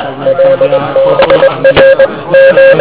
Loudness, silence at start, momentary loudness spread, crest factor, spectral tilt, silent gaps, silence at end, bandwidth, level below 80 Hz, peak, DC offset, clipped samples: -6 LUFS; 0 s; 5 LU; 6 dB; -9 dB/octave; none; 0 s; 4 kHz; -38 dBFS; 0 dBFS; 1%; 5%